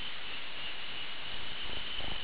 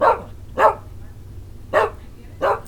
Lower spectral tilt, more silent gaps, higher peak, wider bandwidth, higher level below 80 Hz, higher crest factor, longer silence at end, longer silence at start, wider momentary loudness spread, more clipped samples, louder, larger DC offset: second, 0 dB/octave vs -5.5 dB/octave; neither; second, -24 dBFS vs 0 dBFS; second, 4 kHz vs 18.5 kHz; second, -54 dBFS vs -40 dBFS; second, 12 dB vs 22 dB; about the same, 0 s vs 0 s; about the same, 0 s vs 0 s; second, 2 LU vs 23 LU; neither; second, -38 LUFS vs -20 LUFS; first, 2% vs under 0.1%